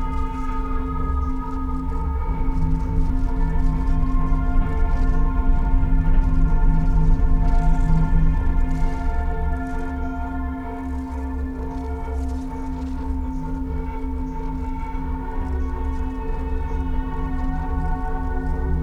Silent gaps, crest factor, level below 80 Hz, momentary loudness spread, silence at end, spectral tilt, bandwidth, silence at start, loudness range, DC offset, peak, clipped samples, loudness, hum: none; 14 dB; -20 dBFS; 7 LU; 0 s; -9 dB/octave; 3.5 kHz; 0 s; 7 LU; under 0.1%; -6 dBFS; under 0.1%; -25 LUFS; none